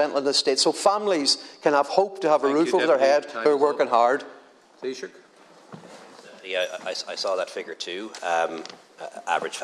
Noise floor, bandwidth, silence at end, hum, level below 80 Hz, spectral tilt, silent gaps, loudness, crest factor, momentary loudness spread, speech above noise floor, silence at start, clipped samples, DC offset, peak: -52 dBFS; 12.5 kHz; 0 s; none; -82 dBFS; -2.5 dB/octave; none; -23 LUFS; 20 dB; 17 LU; 28 dB; 0 s; under 0.1%; under 0.1%; -4 dBFS